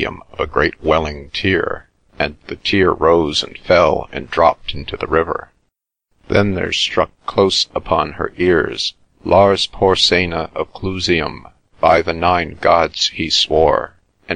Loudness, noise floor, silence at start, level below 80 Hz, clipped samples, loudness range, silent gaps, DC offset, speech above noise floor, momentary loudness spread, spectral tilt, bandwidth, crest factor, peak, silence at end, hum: -16 LUFS; -71 dBFS; 0 s; -38 dBFS; under 0.1%; 3 LU; none; 0.4%; 55 dB; 11 LU; -4.5 dB/octave; 10.5 kHz; 16 dB; 0 dBFS; 0 s; none